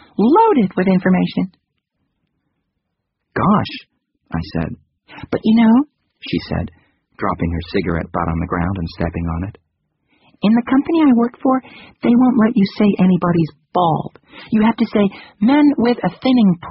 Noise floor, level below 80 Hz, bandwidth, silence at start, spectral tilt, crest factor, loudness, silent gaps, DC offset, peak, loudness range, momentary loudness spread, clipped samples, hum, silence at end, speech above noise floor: -75 dBFS; -40 dBFS; 5.8 kHz; 0.2 s; -6.5 dB/octave; 16 dB; -16 LUFS; none; under 0.1%; -2 dBFS; 7 LU; 12 LU; under 0.1%; none; 0 s; 59 dB